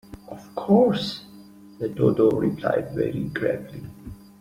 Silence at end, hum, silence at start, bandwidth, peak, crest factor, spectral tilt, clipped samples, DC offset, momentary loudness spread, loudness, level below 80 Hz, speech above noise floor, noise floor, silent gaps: 0.25 s; none; 0.1 s; 15.5 kHz; -6 dBFS; 18 dB; -7.5 dB/octave; under 0.1%; under 0.1%; 22 LU; -23 LUFS; -54 dBFS; 24 dB; -46 dBFS; none